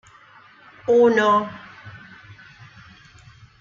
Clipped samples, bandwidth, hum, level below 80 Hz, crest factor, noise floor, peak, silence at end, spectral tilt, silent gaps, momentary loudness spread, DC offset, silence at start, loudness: under 0.1%; 7.2 kHz; none; -62 dBFS; 18 dB; -50 dBFS; -6 dBFS; 1.65 s; -5.5 dB/octave; none; 26 LU; under 0.1%; 0.9 s; -18 LUFS